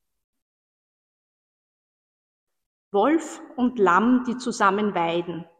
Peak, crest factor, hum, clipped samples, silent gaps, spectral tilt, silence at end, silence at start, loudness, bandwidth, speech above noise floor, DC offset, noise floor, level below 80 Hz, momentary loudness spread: -6 dBFS; 20 dB; none; under 0.1%; none; -5.5 dB/octave; 0.15 s; 2.95 s; -22 LUFS; 9.6 kHz; over 68 dB; under 0.1%; under -90 dBFS; -66 dBFS; 9 LU